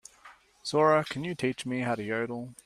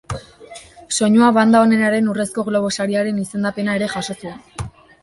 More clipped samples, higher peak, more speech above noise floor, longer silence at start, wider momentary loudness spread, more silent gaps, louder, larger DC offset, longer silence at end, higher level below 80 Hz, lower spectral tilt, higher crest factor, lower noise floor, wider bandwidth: neither; second, -10 dBFS vs -2 dBFS; about the same, 27 dB vs 24 dB; first, 0.25 s vs 0.1 s; second, 11 LU vs 20 LU; neither; second, -29 LUFS vs -17 LUFS; neither; second, 0.1 s vs 0.35 s; second, -68 dBFS vs -48 dBFS; about the same, -5.5 dB/octave vs -5 dB/octave; about the same, 20 dB vs 16 dB; first, -56 dBFS vs -40 dBFS; first, 14.5 kHz vs 11.5 kHz